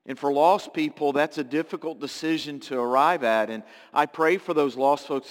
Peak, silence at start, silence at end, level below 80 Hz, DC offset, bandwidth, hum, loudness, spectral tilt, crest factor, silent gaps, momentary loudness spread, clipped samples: -6 dBFS; 0.05 s; 0 s; -76 dBFS; under 0.1%; 17 kHz; none; -24 LUFS; -5 dB/octave; 18 dB; none; 10 LU; under 0.1%